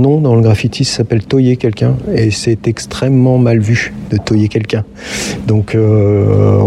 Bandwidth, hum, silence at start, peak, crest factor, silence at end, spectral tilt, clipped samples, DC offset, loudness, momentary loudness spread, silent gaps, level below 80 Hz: 12 kHz; none; 0 s; 0 dBFS; 10 dB; 0 s; -6.5 dB/octave; under 0.1%; under 0.1%; -12 LUFS; 8 LU; none; -38 dBFS